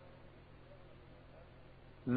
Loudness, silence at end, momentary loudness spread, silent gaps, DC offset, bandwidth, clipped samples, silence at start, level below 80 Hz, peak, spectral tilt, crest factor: -57 LUFS; 0 s; 3 LU; none; under 0.1%; 4.8 kHz; under 0.1%; 0 s; -64 dBFS; -22 dBFS; -8 dB/octave; 22 dB